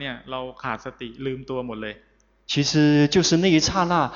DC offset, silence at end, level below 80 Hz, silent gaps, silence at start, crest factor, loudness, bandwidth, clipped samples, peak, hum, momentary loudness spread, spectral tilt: under 0.1%; 0 s; -50 dBFS; none; 0 s; 16 dB; -22 LUFS; 7.6 kHz; under 0.1%; -6 dBFS; none; 15 LU; -4.5 dB/octave